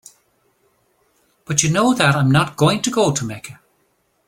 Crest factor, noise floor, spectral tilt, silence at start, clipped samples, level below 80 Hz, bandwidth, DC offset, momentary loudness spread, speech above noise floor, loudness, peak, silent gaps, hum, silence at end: 20 dB; -64 dBFS; -4.5 dB/octave; 1.5 s; under 0.1%; -52 dBFS; 17 kHz; under 0.1%; 13 LU; 48 dB; -17 LUFS; 0 dBFS; none; none; 0.75 s